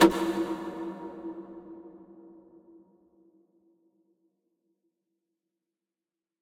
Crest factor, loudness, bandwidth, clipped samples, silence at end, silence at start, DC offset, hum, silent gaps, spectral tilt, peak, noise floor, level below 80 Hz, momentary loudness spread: 28 dB; -32 LUFS; 16.5 kHz; under 0.1%; 4.15 s; 0 s; under 0.1%; none; none; -4.5 dB/octave; -6 dBFS; under -90 dBFS; -64 dBFS; 23 LU